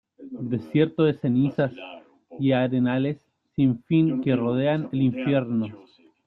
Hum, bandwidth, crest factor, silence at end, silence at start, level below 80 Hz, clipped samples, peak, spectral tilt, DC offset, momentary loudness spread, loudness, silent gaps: none; 4.3 kHz; 16 dB; 0.45 s; 0.2 s; -62 dBFS; under 0.1%; -8 dBFS; -10.5 dB/octave; under 0.1%; 13 LU; -24 LUFS; none